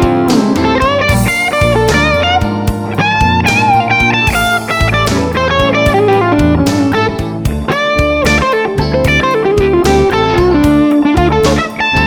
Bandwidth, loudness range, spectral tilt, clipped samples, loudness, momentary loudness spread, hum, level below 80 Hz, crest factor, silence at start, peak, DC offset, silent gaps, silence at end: over 20 kHz; 1 LU; -5.5 dB/octave; under 0.1%; -11 LUFS; 4 LU; none; -22 dBFS; 10 dB; 0 s; 0 dBFS; under 0.1%; none; 0 s